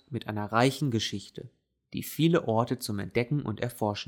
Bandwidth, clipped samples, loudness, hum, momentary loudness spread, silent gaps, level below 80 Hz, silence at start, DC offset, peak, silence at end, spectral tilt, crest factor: 19.5 kHz; under 0.1%; -29 LUFS; none; 14 LU; none; -64 dBFS; 0.1 s; under 0.1%; -10 dBFS; 0.05 s; -5.5 dB/octave; 20 dB